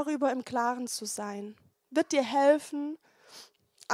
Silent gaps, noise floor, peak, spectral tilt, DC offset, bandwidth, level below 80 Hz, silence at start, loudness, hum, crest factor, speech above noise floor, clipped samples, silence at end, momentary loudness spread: none; -57 dBFS; -12 dBFS; -3 dB/octave; under 0.1%; 15.5 kHz; -80 dBFS; 0 s; -30 LUFS; none; 20 dB; 27 dB; under 0.1%; 0 s; 25 LU